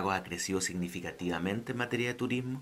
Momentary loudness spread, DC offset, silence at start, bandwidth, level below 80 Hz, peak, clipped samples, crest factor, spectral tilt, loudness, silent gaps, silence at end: 4 LU; under 0.1%; 0 s; 16 kHz; -62 dBFS; -14 dBFS; under 0.1%; 20 dB; -4.5 dB/octave; -34 LUFS; none; 0 s